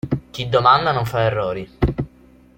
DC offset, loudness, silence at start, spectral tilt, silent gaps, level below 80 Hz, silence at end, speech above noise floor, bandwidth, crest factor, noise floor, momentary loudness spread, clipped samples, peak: under 0.1%; -19 LUFS; 0.05 s; -6.5 dB/octave; none; -36 dBFS; 0.5 s; 31 dB; 16.5 kHz; 18 dB; -49 dBFS; 12 LU; under 0.1%; -2 dBFS